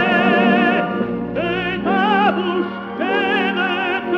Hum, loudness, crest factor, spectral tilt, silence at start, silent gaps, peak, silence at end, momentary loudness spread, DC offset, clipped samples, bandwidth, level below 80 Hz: none; -18 LUFS; 14 dB; -7 dB/octave; 0 s; none; -2 dBFS; 0 s; 8 LU; under 0.1%; under 0.1%; 6.6 kHz; -50 dBFS